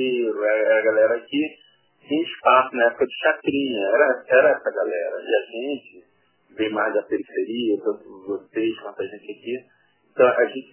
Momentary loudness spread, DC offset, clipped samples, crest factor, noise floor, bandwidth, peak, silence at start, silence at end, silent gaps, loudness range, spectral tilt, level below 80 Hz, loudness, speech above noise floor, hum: 15 LU; under 0.1%; under 0.1%; 20 dB; -59 dBFS; 3.2 kHz; -2 dBFS; 0 s; 0.1 s; none; 7 LU; -8 dB/octave; -68 dBFS; -22 LUFS; 37 dB; none